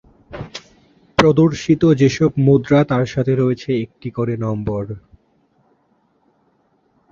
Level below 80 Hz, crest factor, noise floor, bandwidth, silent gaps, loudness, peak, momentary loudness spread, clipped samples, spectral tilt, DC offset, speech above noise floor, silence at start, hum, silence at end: -46 dBFS; 18 dB; -61 dBFS; 7.6 kHz; none; -17 LUFS; 0 dBFS; 19 LU; under 0.1%; -7.5 dB/octave; under 0.1%; 45 dB; 0.3 s; none; 2.15 s